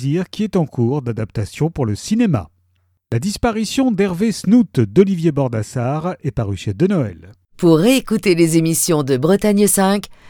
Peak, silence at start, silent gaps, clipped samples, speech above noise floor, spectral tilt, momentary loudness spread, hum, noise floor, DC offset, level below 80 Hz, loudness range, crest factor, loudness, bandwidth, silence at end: 0 dBFS; 0 s; none; under 0.1%; 46 dB; -5.5 dB/octave; 9 LU; none; -62 dBFS; under 0.1%; -42 dBFS; 5 LU; 16 dB; -17 LUFS; over 20 kHz; 0 s